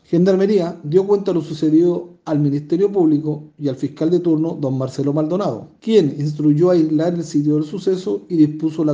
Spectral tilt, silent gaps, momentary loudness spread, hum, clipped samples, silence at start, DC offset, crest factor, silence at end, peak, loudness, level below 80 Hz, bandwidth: -8.5 dB/octave; none; 8 LU; none; under 0.1%; 0.1 s; under 0.1%; 16 dB; 0 s; -2 dBFS; -18 LUFS; -64 dBFS; 7.6 kHz